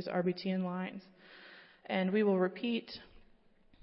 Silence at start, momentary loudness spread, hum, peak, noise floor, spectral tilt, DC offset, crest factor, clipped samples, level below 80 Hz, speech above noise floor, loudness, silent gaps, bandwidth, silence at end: 0 s; 23 LU; none; -20 dBFS; -64 dBFS; -10 dB/octave; under 0.1%; 16 dB; under 0.1%; -70 dBFS; 30 dB; -34 LUFS; none; 5.8 kHz; 0.75 s